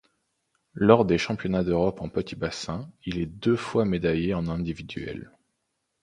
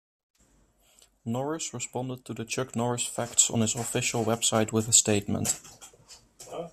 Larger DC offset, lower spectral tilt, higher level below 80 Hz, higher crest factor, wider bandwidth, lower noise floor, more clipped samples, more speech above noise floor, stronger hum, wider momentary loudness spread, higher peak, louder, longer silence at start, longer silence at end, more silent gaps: neither; first, -7 dB/octave vs -3 dB/octave; first, -48 dBFS vs -62 dBFS; about the same, 26 dB vs 24 dB; second, 10.5 kHz vs 14 kHz; first, -78 dBFS vs -64 dBFS; neither; first, 53 dB vs 36 dB; neither; about the same, 15 LU vs 17 LU; first, 0 dBFS vs -6 dBFS; about the same, -26 LUFS vs -26 LUFS; second, 0.75 s vs 1.25 s; first, 0.8 s vs 0.05 s; neither